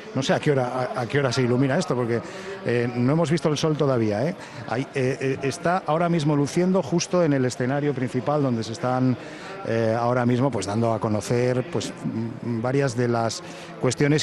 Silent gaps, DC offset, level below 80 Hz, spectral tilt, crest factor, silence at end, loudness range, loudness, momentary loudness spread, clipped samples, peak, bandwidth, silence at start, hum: none; under 0.1%; -60 dBFS; -6 dB/octave; 16 dB; 0 s; 1 LU; -24 LUFS; 7 LU; under 0.1%; -8 dBFS; 12 kHz; 0 s; none